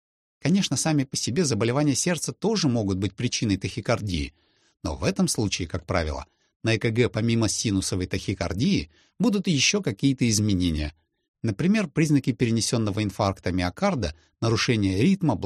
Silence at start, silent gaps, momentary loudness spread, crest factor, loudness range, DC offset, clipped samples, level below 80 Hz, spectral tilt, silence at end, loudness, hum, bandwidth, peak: 0.45 s; 6.56-6.60 s, 11.28-11.34 s; 8 LU; 18 dB; 3 LU; under 0.1%; under 0.1%; -44 dBFS; -5 dB/octave; 0 s; -24 LUFS; none; 13.5 kHz; -6 dBFS